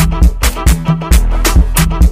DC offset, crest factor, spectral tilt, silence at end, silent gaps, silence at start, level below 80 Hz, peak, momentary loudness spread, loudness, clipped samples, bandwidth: under 0.1%; 10 dB; -5 dB/octave; 0 s; none; 0 s; -10 dBFS; 0 dBFS; 2 LU; -12 LUFS; under 0.1%; 16 kHz